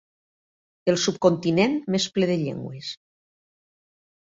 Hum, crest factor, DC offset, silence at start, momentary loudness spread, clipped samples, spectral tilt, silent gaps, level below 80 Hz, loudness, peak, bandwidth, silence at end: none; 20 dB; under 0.1%; 0.85 s; 14 LU; under 0.1%; -5 dB/octave; none; -64 dBFS; -23 LUFS; -6 dBFS; 7.8 kHz; 1.3 s